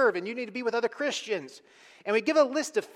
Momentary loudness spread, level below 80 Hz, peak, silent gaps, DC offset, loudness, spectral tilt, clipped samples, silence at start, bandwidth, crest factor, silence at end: 10 LU; -80 dBFS; -10 dBFS; none; under 0.1%; -28 LUFS; -3 dB/octave; under 0.1%; 0 s; 15 kHz; 18 dB; 0.1 s